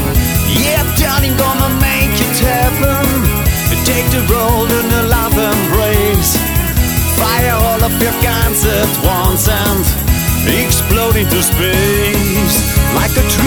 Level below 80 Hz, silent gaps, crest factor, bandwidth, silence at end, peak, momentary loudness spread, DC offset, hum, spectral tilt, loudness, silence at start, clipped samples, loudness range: -18 dBFS; none; 12 dB; over 20 kHz; 0 s; 0 dBFS; 1 LU; under 0.1%; none; -4 dB/octave; -12 LUFS; 0 s; under 0.1%; 0 LU